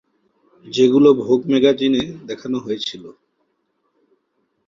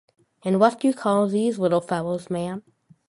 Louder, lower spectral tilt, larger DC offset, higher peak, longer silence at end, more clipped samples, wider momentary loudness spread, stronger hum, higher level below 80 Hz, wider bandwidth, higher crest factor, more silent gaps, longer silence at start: first, -17 LUFS vs -23 LUFS; about the same, -6 dB/octave vs -7 dB/octave; neither; about the same, -2 dBFS vs -4 dBFS; first, 1.55 s vs 0.5 s; neither; first, 15 LU vs 11 LU; neither; about the same, -60 dBFS vs -64 dBFS; second, 7.6 kHz vs 11.5 kHz; about the same, 18 dB vs 20 dB; neither; first, 0.65 s vs 0.45 s